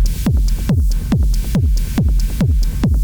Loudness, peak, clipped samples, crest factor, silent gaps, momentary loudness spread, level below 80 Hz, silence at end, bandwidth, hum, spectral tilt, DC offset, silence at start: -17 LUFS; -6 dBFS; under 0.1%; 8 dB; none; 1 LU; -16 dBFS; 0 s; over 20 kHz; none; -7 dB/octave; under 0.1%; 0 s